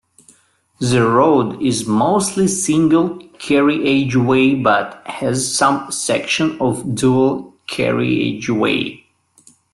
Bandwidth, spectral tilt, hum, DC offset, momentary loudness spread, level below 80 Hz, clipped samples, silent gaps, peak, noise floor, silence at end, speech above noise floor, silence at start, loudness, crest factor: 12.5 kHz; -5 dB/octave; none; under 0.1%; 7 LU; -52 dBFS; under 0.1%; none; -2 dBFS; -56 dBFS; 0.8 s; 40 dB; 0.8 s; -16 LUFS; 14 dB